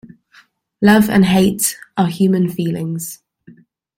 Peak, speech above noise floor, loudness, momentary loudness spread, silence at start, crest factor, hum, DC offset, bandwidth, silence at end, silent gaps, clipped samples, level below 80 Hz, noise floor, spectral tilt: -2 dBFS; 37 dB; -15 LUFS; 12 LU; 0.8 s; 16 dB; none; under 0.1%; 16.5 kHz; 0.8 s; none; under 0.1%; -50 dBFS; -51 dBFS; -5.5 dB/octave